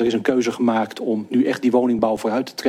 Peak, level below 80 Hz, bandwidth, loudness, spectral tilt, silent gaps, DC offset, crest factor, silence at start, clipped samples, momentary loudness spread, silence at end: -4 dBFS; -60 dBFS; 14.5 kHz; -20 LUFS; -5.5 dB/octave; none; under 0.1%; 16 dB; 0 s; under 0.1%; 5 LU; 0 s